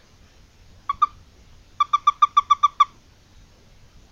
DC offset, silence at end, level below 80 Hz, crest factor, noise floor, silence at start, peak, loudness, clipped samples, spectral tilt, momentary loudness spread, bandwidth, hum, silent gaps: under 0.1%; 1.25 s; -54 dBFS; 20 dB; -52 dBFS; 0.9 s; -6 dBFS; -20 LUFS; under 0.1%; -0.5 dB/octave; 9 LU; 7.2 kHz; none; none